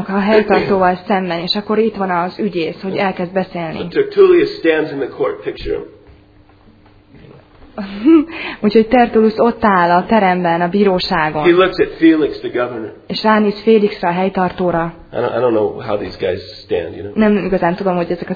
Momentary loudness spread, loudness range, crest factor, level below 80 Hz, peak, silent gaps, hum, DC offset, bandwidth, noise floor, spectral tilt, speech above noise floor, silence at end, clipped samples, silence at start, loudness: 10 LU; 6 LU; 14 dB; -44 dBFS; 0 dBFS; none; none; under 0.1%; 5 kHz; -46 dBFS; -8 dB/octave; 32 dB; 0 s; under 0.1%; 0 s; -15 LUFS